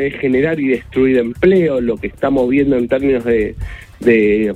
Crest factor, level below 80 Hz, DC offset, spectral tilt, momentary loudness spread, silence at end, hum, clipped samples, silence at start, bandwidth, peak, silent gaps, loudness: 14 dB; -36 dBFS; under 0.1%; -8 dB/octave; 7 LU; 0 s; none; under 0.1%; 0 s; 9.4 kHz; 0 dBFS; none; -15 LUFS